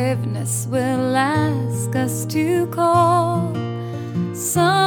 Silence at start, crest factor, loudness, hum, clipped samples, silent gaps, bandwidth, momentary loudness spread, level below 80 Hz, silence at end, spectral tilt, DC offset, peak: 0 s; 16 dB; -20 LUFS; none; under 0.1%; none; over 20 kHz; 9 LU; -62 dBFS; 0 s; -5.5 dB/octave; under 0.1%; -4 dBFS